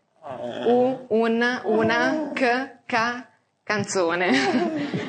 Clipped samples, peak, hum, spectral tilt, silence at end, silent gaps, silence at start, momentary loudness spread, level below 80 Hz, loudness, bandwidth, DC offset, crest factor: under 0.1%; -6 dBFS; none; -4.5 dB/octave; 0 s; none; 0.25 s; 7 LU; -74 dBFS; -23 LUFS; 9.6 kHz; under 0.1%; 16 dB